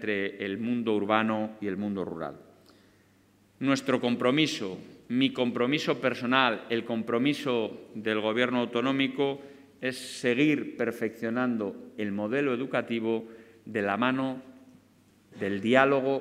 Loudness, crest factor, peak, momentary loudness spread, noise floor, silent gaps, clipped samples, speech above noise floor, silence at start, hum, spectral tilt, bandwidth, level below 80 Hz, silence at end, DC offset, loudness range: -28 LUFS; 24 dB; -6 dBFS; 11 LU; -62 dBFS; none; under 0.1%; 34 dB; 0 s; none; -5.5 dB/octave; 14.5 kHz; -74 dBFS; 0 s; under 0.1%; 4 LU